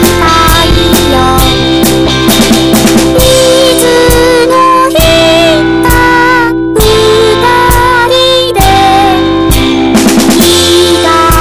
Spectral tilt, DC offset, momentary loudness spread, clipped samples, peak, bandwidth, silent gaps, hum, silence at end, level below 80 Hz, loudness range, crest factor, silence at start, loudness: -4 dB/octave; under 0.1%; 3 LU; 2%; 0 dBFS; over 20 kHz; none; none; 0 s; -18 dBFS; 1 LU; 6 dB; 0 s; -5 LUFS